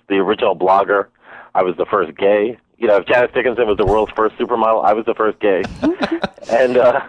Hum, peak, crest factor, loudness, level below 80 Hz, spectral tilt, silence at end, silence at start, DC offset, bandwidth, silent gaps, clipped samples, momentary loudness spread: none; -2 dBFS; 12 dB; -16 LUFS; -42 dBFS; -6.5 dB/octave; 0 s; 0.1 s; under 0.1%; 9.4 kHz; none; under 0.1%; 6 LU